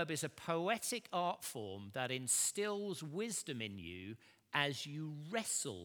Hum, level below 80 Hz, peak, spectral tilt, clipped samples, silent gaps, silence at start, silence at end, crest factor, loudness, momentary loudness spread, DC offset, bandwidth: none; -82 dBFS; -18 dBFS; -2.5 dB/octave; under 0.1%; none; 0 s; 0 s; 22 dB; -39 LUFS; 12 LU; under 0.1%; over 20 kHz